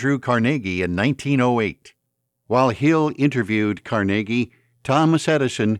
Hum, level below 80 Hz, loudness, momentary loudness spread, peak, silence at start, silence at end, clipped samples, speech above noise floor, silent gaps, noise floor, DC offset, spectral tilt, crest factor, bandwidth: none; -56 dBFS; -20 LUFS; 6 LU; -4 dBFS; 0 s; 0 s; under 0.1%; 56 dB; none; -75 dBFS; under 0.1%; -6.5 dB/octave; 16 dB; 11.5 kHz